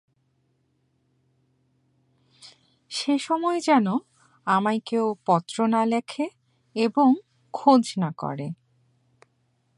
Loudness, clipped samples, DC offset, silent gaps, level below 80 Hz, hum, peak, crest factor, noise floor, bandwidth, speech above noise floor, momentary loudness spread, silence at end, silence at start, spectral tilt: -24 LUFS; under 0.1%; under 0.1%; none; -76 dBFS; none; -4 dBFS; 22 dB; -70 dBFS; 11.5 kHz; 47 dB; 14 LU; 1.25 s; 2.45 s; -5.5 dB/octave